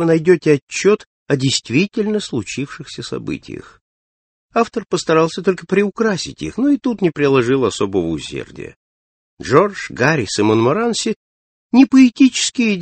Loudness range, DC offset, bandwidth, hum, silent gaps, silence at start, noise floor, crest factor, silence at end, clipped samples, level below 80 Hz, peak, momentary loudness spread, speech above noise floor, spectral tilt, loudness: 7 LU; under 0.1%; 8.8 kHz; none; 0.62-0.67 s, 1.07-1.26 s, 3.81-4.49 s, 8.76-9.37 s, 11.16-11.70 s; 0 s; under -90 dBFS; 16 dB; 0 s; under 0.1%; -52 dBFS; 0 dBFS; 14 LU; over 74 dB; -5 dB/octave; -16 LUFS